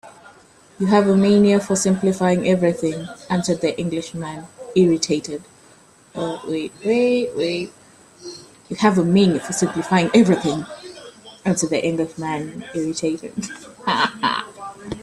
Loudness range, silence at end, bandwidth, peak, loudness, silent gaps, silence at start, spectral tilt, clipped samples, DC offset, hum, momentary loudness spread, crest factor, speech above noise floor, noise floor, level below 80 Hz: 6 LU; 0 s; 12.5 kHz; -2 dBFS; -20 LUFS; none; 0.05 s; -5.5 dB/octave; under 0.1%; under 0.1%; none; 19 LU; 18 dB; 31 dB; -50 dBFS; -56 dBFS